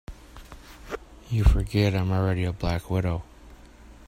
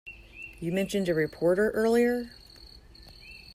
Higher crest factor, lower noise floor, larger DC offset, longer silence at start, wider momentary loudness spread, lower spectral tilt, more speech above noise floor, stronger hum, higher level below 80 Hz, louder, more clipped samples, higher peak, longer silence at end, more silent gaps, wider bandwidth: first, 20 dB vs 14 dB; about the same, -48 dBFS vs -51 dBFS; neither; about the same, 0.1 s vs 0.05 s; about the same, 23 LU vs 23 LU; about the same, -7 dB/octave vs -6 dB/octave; about the same, 25 dB vs 25 dB; neither; first, -32 dBFS vs -54 dBFS; about the same, -26 LUFS vs -27 LUFS; neither; first, -6 dBFS vs -14 dBFS; about the same, 0.05 s vs 0 s; neither; about the same, 15 kHz vs 15.5 kHz